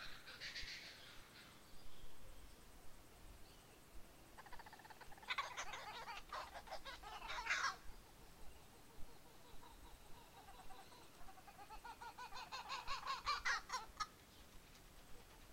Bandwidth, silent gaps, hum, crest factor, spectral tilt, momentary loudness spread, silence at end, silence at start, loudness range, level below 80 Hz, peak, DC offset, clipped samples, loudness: 16 kHz; none; none; 22 dB; -1.5 dB/octave; 20 LU; 0 s; 0 s; 15 LU; -64 dBFS; -28 dBFS; under 0.1%; under 0.1%; -48 LUFS